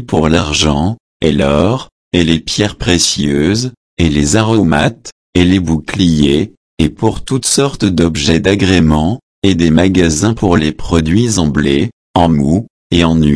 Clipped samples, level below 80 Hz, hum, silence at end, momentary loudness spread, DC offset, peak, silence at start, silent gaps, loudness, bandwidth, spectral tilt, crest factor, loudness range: 0.1%; -28 dBFS; none; 0 s; 7 LU; 0.2%; 0 dBFS; 0 s; 1.00-1.20 s, 1.92-2.11 s, 3.77-3.97 s, 5.12-5.33 s, 6.57-6.77 s, 9.23-9.42 s, 11.93-12.14 s, 12.70-12.90 s; -12 LUFS; 11 kHz; -5 dB/octave; 12 dB; 2 LU